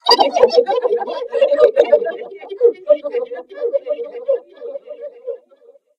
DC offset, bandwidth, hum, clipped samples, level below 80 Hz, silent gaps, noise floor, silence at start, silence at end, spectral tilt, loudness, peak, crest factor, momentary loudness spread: under 0.1%; 11.5 kHz; none; under 0.1%; -66 dBFS; none; -49 dBFS; 0.05 s; 0.6 s; -2 dB/octave; -16 LUFS; 0 dBFS; 18 dB; 19 LU